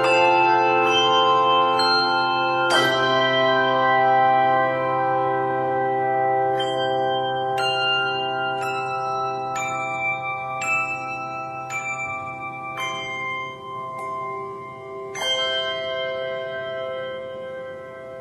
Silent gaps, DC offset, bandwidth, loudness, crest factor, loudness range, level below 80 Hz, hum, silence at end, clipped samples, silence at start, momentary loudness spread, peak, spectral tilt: none; under 0.1%; 13.5 kHz; -21 LUFS; 16 dB; 10 LU; -66 dBFS; none; 0 s; under 0.1%; 0 s; 14 LU; -6 dBFS; -3.5 dB/octave